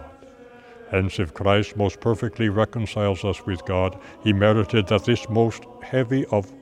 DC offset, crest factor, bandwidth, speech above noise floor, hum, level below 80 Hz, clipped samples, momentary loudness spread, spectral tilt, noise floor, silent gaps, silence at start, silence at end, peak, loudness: under 0.1%; 20 dB; 10 kHz; 24 dB; none; -48 dBFS; under 0.1%; 7 LU; -7 dB/octave; -46 dBFS; none; 0 s; 0 s; -2 dBFS; -23 LUFS